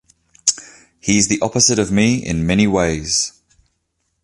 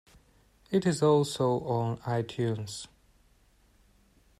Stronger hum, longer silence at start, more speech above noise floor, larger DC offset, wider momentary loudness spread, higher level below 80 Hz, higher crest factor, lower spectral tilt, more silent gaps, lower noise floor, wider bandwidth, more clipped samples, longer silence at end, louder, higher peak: neither; second, 0.45 s vs 0.7 s; first, 54 dB vs 36 dB; neither; second, 5 LU vs 14 LU; first, -40 dBFS vs -64 dBFS; about the same, 18 dB vs 18 dB; second, -3.5 dB/octave vs -6 dB/octave; neither; first, -70 dBFS vs -64 dBFS; second, 11.5 kHz vs 14 kHz; neither; second, 0.95 s vs 1.55 s; first, -16 LUFS vs -29 LUFS; first, 0 dBFS vs -14 dBFS